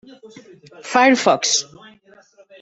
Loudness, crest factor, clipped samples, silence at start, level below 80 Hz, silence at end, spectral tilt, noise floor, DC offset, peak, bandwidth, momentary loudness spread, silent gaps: -16 LUFS; 18 dB; under 0.1%; 0.25 s; -66 dBFS; 1 s; -1.5 dB/octave; -50 dBFS; under 0.1%; -2 dBFS; 8.4 kHz; 22 LU; none